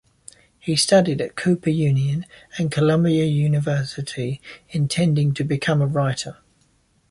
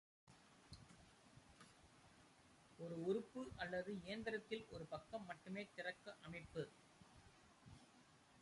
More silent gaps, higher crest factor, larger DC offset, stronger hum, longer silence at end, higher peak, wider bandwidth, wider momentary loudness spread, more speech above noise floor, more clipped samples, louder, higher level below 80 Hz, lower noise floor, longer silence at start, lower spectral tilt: neither; about the same, 18 dB vs 20 dB; neither; neither; first, 0.8 s vs 0 s; first, -4 dBFS vs -32 dBFS; about the same, 11.5 kHz vs 11.5 kHz; second, 12 LU vs 21 LU; first, 41 dB vs 21 dB; neither; first, -21 LUFS vs -50 LUFS; first, -54 dBFS vs -76 dBFS; second, -62 dBFS vs -70 dBFS; first, 0.65 s vs 0.25 s; about the same, -6 dB/octave vs -5.5 dB/octave